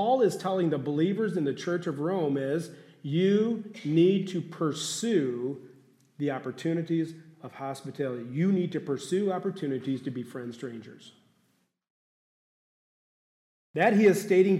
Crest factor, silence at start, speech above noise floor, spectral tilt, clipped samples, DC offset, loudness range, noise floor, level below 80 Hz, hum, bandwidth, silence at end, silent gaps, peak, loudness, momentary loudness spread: 18 dB; 0 s; 44 dB; -6 dB/octave; under 0.1%; under 0.1%; 10 LU; -72 dBFS; -80 dBFS; none; 14.5 kHz; 0 s; 11.90-13.74 s; -10 dBFS; -28 LUFS; 15 LU